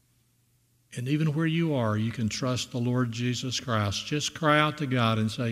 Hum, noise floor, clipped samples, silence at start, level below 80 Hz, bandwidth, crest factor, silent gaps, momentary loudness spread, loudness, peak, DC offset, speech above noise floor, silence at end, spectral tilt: none; -67 dBFS; under 0.1%; 0.9 s; -62 dBFS; 15 kHz; 22 dB; none; 6 LU; -27 LUFS; -6 dBFS; under 0.1%; 41 dB; 0 s; -5 dB/octave